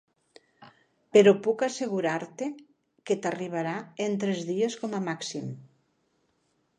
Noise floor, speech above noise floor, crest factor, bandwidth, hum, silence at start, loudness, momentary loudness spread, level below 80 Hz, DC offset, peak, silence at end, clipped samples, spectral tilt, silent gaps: -72 dBFS; 46 dB; 22 dB; 10 kHz; none; 0.6 s; -27 LUFS; 16 LU; -78 dBFS; under 0.1%; -6 dBFS; 1.15 s; under 0.1%; -5 dB/octave; none